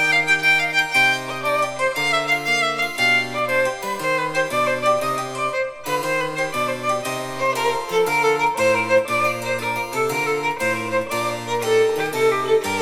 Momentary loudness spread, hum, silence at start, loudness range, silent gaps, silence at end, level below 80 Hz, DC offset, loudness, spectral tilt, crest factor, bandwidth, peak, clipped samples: 7 LU; none; 0 s; 4 LU; none; 0 s; -56 dBFS; under 0.1%; -20 LUFS; -3 dB/octave; 16 dB; 17.5 kHz; -6 dBFS; under 0.1%